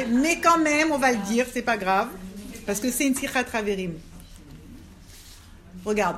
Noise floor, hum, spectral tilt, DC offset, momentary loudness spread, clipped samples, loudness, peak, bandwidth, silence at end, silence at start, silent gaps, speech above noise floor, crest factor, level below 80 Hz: -46 dBFS; none; -3.5 dB/octave; under 0.1%; 16 LU; under 0.1%; -23 LUFS; -6 dBFS; 16 kHz; 0 s; 0 s; none; 23 dB; 20 dB; -50 dBFS